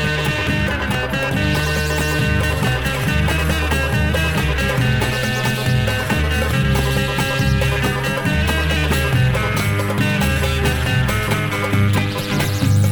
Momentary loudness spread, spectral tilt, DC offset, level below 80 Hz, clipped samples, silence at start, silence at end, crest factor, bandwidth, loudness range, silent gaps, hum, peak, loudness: 2 LU; -5 dB/octave; 0.7%; -26 dBFS; under 0.1%; 0 s; 0 s; 14 dB; over 20 kHz; 1 LU; none; none; -4 dBFS; -18 LUFS